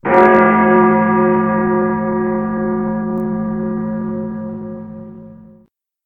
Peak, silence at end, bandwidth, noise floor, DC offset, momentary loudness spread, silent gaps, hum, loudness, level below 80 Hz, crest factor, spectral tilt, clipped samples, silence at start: 0 dBFS; 0.6 s; 4.1 kHz; -52 dBFS; 0.1%; 18 LU; none; none; -15 LUFS; -46 dBFS; 16 dB; -10 dB/octave; under 0.1%; 0.05 s